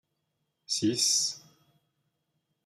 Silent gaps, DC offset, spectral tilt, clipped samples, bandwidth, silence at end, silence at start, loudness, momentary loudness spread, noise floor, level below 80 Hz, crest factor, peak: none; under 0.1%; -2 dB/octave; under 0.1%; 14 kHz; 1.25 s; 0.7 s; -27 LUFS; 10 LU; -80 dBFS; -80 dBFS; 20 dB; -14 dBFS